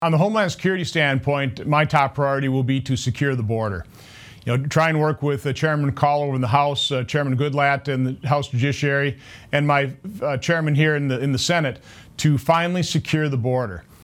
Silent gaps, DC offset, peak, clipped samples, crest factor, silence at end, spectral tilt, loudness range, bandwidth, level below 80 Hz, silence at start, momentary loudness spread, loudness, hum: none; under 0.1%; -2 dBFS; under 0.1%; 20 dB; 0.2 s; -6 dB/octave; 2 LU; 15 kHz; -52 dBFS; 0 s; 6 LU; -21 LUFS; none